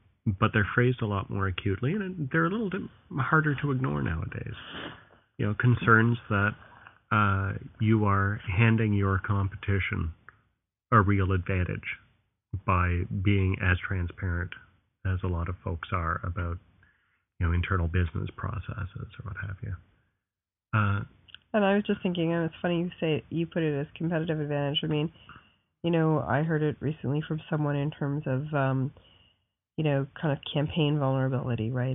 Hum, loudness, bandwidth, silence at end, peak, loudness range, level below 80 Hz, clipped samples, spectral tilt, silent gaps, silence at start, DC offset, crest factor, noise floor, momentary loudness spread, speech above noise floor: none; -28 LUFS; 3.9 kHz; 0 s; -6 dBFS; 6 LU; -48 dBFS; under 0.1%; -4.5 dB/octave; none; 0.25 s; under 0.1%; 22 dB; under -90 dBFS; 12 LU; over 63 dB